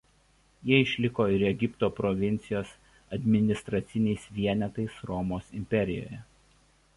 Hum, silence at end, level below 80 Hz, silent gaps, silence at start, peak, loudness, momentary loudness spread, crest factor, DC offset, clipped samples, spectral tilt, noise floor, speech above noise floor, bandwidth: none; 0.75 s; -52 dBFS; none; 0.65 s; -10 dBFS; -29 LUFS; 12 LU; 20 dB; under 0.1%; under 0.1%; -7 dB/octave; -64 dBFS; 36 dB; 11.5 kHz